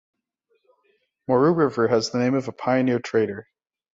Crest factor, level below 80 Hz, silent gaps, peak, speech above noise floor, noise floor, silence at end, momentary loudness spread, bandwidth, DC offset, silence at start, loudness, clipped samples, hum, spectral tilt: 16 dB; -64 dBFS; none; -6 dBFS; 50 dB; -71 dBFS; 0.55 s; 8 LU; 7.8 kHz; under 0.1%; 1.3 s; -22 LUFS; under 0.1%; none; -6.5 dB/octave